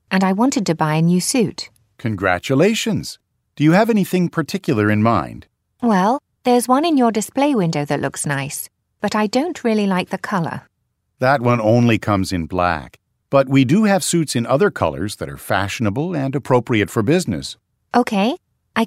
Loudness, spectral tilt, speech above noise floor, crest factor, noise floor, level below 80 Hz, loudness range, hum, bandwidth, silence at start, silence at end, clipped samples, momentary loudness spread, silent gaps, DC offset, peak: -18 LUFS; -5.5 dB/octave; 53 dB; 16 dB; -70 dBFS; -50 dBFS; 3 LU; none; 16 kHz; 0.1 s; 0 s; under 0.1%; 11 LU; none; under 0.1%; -2 dBFS